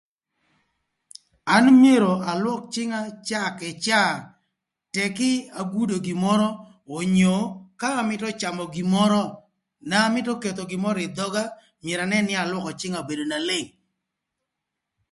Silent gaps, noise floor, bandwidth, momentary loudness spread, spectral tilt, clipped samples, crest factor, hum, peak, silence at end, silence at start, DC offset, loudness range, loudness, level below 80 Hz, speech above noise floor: none; -83 dBFS; 11.5 kHz; 10 LU; -5 dB/octave; under 0.1%; 20 dB; none; -4 dBFS; 1.45 s; 1.45 s; under 0.1%; 6 LU; -23 LUFS; -64 dBFS; 61 dB